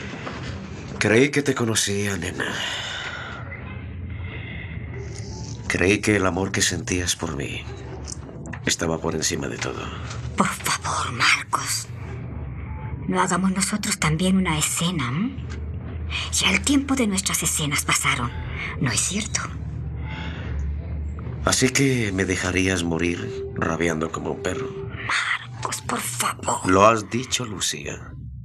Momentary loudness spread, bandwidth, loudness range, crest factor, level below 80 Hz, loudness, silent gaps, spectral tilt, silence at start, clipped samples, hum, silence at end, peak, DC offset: 15 LU; 15 kHz; 5 LU; 24 dB; -40 dBFS; -23 LUFS; none; -3.5 dB/octave; 0 s; under 0.1%; none; 0 s; -2 dBFS; under 0.1%